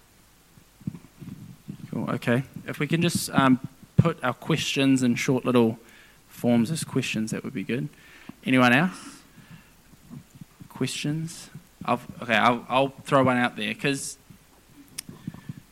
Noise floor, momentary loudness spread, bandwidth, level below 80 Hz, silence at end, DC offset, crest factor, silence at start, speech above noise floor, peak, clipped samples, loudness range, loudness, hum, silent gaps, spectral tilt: -57 dBFS; 22 LU; 16 kHz; -58 dBFS; 0.2 s; under 0.1%; 20 dB; 0.85 s; 33 dB; -6 dBFS; under 0.1%; 5 LU; -25 LUFS; none; none; -5 dB/octave